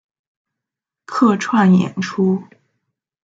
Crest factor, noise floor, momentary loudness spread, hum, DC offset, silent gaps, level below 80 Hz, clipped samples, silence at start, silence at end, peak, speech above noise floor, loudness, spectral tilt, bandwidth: 16 dB; -85 dBFS; 10 LU; none; under 0.1%; none; -64 dBFS; under 0.1%; 1.1 s; 0.8 s; -2 dBFS; 70 dB; -16 LUFS; -7 dB/octave; 7.8 kHz